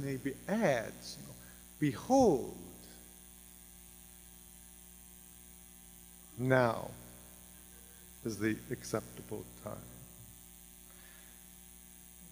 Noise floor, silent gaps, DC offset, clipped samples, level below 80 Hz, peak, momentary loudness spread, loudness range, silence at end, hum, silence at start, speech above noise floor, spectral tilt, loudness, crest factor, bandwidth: -56 dBFS; none; under 0.1%; under 0.1%; -62 dBFS; -12 dBFS; 23 LU; 17 LU; 0 s; 60 Hz at -60 dBFS; 0 s; 22 dB; -5.5 dB/octave; -35 LUFS; 26 dB; 15.5 kHz